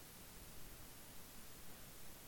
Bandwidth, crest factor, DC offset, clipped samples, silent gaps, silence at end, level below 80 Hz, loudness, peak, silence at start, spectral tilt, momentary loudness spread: 17.5 kHz; 12 dB; under 0.1%; under 0.1%; none; 0 s; -64 dBFS; -56 LUFS; -42 dBFS; 0 s; -2.5 dB/octave; 0 LU